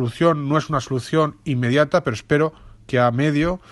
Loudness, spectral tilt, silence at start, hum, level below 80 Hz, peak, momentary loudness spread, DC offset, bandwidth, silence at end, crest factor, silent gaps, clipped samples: -20 LUFS; -6.5 dB/octave; 0 s; none; -46 dBFS; -4 dBFS; 6 LU; under 0.1%; 12 kHz; 0.15 s; 16 dB; none; under 0.1%